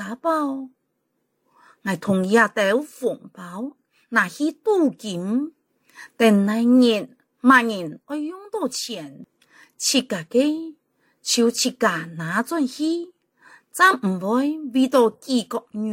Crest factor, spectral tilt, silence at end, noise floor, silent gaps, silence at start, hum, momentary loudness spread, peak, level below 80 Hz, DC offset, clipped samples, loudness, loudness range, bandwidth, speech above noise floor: 20 dB; -4 dB/octave; 0 s; -73 dBFS; none; 0 s; none; 16 LU; -2 dBFS; -70 dBFS; under 0.1%; under 0.1%; -21 LUFS; 5 LU; 16.5 kHz; 52 dB